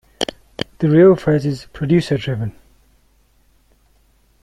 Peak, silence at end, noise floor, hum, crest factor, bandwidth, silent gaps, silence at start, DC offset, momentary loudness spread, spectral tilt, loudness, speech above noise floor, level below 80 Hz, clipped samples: -2 dBFS; 1.95 s; -56 dBFS; none; 18 dB; 12 kHz; none; 0.2 s; under 0.1%; 16 LU; -7.5 dB/octave; -17 LUFS; 41 dB; -48 dBFS; under 0.1%